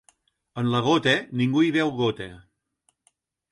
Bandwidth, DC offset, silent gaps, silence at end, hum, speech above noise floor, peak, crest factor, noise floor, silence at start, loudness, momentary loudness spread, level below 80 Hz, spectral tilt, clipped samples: 11.5 kHz; under 0.1%; none; 1.1 s; none; 48 dB; -8 dBFS; 18 dB; -71 dBFS; 0.55 s; -23 LUFS; 16 LU; -60 dBFS; -6 dB/octave; under 0.1%